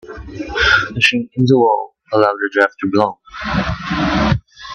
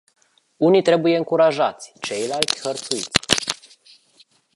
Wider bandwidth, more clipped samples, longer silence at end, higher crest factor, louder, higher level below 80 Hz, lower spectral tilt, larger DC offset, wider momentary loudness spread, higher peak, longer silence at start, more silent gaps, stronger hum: second, 10 kHz vs 16 kHz; neither; second, 0 s vs 1 s; second, 16 dB vs 22 dB; first, -16 LUFS vs -19 LUFS; first, -34 dBFS vs -54 dBFS; first, -5.5 dB/octave vs -3.5 dB/octave; neither; about the same, 9 LU vs 11 LU; about the same, 0 dBFS vs 0 dBFS; second, 0.05 s vs 0.6 s; neither; neither